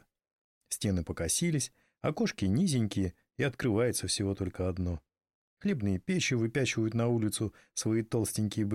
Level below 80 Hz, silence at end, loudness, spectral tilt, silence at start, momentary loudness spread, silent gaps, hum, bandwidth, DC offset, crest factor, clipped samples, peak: -54 dBFS; 0 s; -32 LUFS; -5 dB/octave; 0.7 s; 7 LU; 5.34-5.57 s; none; 15.5 kHz; under 0.1%; 14 dB; under 0.1%; -18 dBFS